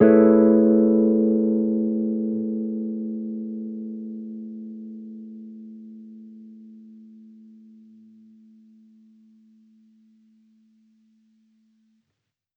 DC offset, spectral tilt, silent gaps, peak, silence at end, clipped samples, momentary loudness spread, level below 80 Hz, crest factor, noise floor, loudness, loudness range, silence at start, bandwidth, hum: under 0.1%; -13 dB/octave; none; -2 dBFS; 5.8 s; under 0.1%; 27 LU; -64 dBFS; 22 dB; -80 dBFS; -21 LUFS; 26 LU; 0 s; 2.6 kHz; none